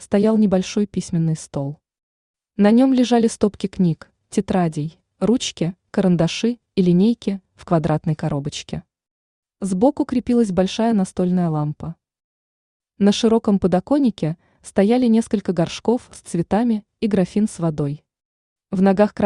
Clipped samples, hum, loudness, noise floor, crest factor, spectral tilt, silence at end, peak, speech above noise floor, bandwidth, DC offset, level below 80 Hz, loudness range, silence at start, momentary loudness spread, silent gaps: under 0.1%; none; -19 LUFS; under -90 dBFS; 16 dB; -6.5 dB/octave; 0 s; -4 dBFS; over 72 dB; 11 kHz; under 0.1%; -50 dBFS; 3 LU; 0 s; 12 LU; 2.03-2.34 s, 9.11-9.43 s, 12.24-12.80 s, 18.25-18.56 s